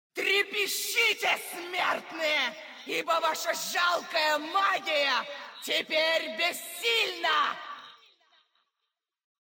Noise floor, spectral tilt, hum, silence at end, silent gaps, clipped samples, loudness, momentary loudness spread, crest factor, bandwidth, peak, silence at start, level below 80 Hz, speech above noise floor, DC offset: -85 dBFS; 0 dB/octave; none; 1.6 s; none; under 0.1%; -27 LUFS; 8 LU; 16 dB; 17 kHz; -14 dBFS; 0.15 s; under -90 dBFS; 56 dB; under 0.1%